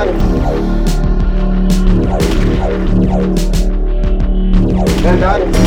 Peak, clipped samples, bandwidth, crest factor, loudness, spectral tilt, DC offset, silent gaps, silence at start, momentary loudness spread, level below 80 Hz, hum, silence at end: 0 dBFS; under 0.1%; 12.5 kHz; 10 dB; -14 LUFS; -7 dB/octave; under 0.1%; none; 0 s; 4 LU; -12 dBFS; none; 0 s